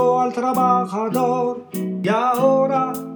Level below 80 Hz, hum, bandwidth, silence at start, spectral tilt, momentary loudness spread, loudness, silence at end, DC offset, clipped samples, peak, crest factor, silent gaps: -72 dBFS; none; over 20 kHz; 0 s; -6.5 dB/octave; 7 LU; -19 LUFS; 0 s; under 0.1%; under 0.1%; -6 dBFS; 14 dB; none